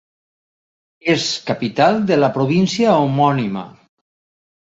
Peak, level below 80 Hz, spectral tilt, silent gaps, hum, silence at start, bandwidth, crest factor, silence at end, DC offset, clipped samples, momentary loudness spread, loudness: -2 dBFS; -58 dBFS; -5.5 dB/octave; none; none; 1.05 s; 8 kHz; 16 dB; 0.95 s; under 0.1%; under 0.1%; 8 LU; -17 LUFS